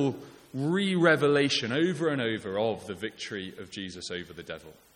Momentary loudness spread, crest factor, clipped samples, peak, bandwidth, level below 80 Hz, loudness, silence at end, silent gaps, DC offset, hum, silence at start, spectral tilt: 18 LU; 20 dB; under 0.1%; -10 dBFS; 15.5 kHz; -68 dBFS; -28 LUFS; 0.25 s; none; under 0.1%; none; 0 s; -5 dB/octave